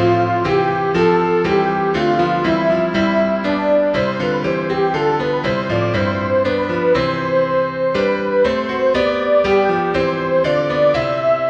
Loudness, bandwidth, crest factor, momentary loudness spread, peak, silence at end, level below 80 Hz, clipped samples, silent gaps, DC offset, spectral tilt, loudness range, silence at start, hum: -17 LUFS; 8 kHz; 14 dB; 3 LU; -4 dBFS; 0 s; -44 dBFS; under 0.1%; none; 0.1%; -7 dB/octave; 2 LU; 0 s; none